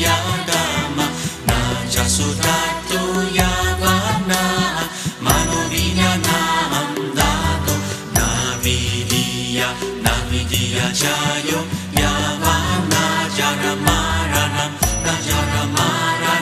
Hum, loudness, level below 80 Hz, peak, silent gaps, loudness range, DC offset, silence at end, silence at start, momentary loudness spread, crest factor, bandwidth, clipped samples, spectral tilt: none; -18 LUFS; -30 dBFS; 0 dBFS; none; 1 LU; under 0.1%; 0 s; 0 s; 4 LU; 18 dB; 15 kHz; under 0.1%; -3.5 dB/octave